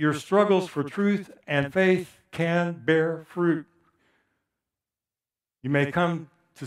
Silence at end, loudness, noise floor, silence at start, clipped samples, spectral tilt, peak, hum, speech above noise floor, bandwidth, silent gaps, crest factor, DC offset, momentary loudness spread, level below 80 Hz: 0 s; -25 LUFS; under -90 dBFS; 0 s; under 0.1%; -7 dB/octave; -6 dBFS; none; over 66 dB; 13.5 kHz; none; 20 dB; under 0.1%; 8 LU; -66 dBFS